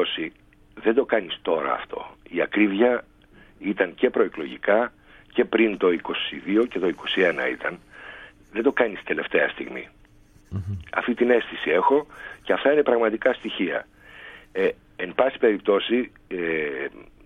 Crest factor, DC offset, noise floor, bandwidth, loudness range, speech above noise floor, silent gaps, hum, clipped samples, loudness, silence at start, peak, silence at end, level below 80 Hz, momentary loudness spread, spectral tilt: 20 dB; under 0.1%; -53 dBFS; 6.8 kHz; 3 LU; 30 dB; none; none; under 0.1%; -24 LUFS; 0 s; -6 dBFS; 0.25 s; -56 dBFS; 14 LU; -7 dB/octave